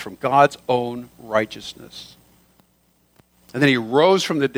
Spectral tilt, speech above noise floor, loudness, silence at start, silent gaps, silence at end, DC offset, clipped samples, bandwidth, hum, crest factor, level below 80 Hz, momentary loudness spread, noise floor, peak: -5 dB/octave; 42 dB; -19 LUFS; 0 s; none; 0 s; under 0.1%; under 0.1%; over 20 kHz; none; 20 dB; -62 dBFS; 19 LU; -62 dBFS; -2 dBFS